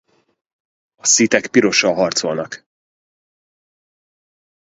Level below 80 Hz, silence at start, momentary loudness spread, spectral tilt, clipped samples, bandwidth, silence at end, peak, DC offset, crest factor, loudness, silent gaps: -62 dBFS; 1.05 s; 14 LU; -2 dB/octave; under 0.1%; 8 kHz; 2.1 s; 0 dBFS; under 0.1%; 20 dB; -15 LUFS; none